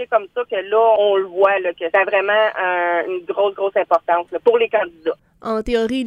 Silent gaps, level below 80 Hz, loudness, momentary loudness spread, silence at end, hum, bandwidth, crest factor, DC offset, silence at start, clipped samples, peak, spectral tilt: none; -48 dBFS; -18 LUFS; 8 LU; 0 s; none; 10.5 kHz; 16 dB; under 0.1%; 0 s; under 0.1%; -2 dBFS; -5 dB/octave